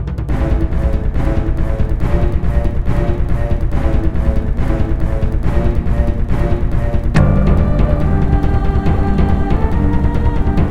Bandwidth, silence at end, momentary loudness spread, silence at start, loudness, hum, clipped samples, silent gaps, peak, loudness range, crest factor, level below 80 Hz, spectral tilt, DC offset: 6.8 kHz; 0 s; 4 LU; 0 s; -17 LUFS; none; under 0.1%; none; 0 dBFS; 3 LU; 12 dB; -16 dBFS; -9 dB/octave; 6%